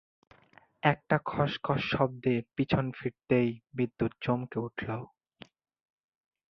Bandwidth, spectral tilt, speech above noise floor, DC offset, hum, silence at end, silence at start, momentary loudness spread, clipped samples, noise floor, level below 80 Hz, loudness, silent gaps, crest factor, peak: 6.2 kHz; -8.5 dB/octave; 31 dB; under 0.1%; none; 1.45 s; 0.85 s; 8 LU; under 0.1%; -62 dBFS; -58 dBFS; -31 LUFS; none; 24 dB; -8 dBFS